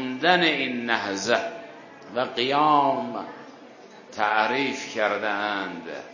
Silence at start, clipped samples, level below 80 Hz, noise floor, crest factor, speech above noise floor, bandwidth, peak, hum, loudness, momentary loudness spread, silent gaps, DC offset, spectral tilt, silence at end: 0 s; under 0.1%; -72 dBFS; -46 dBFS; 22 dB; 22 dB; 7.4 kHz; -2 dBFS; none; -24 LUFS; 19 LU; none; under 0.1%; -3.5 dB/octave; 0 s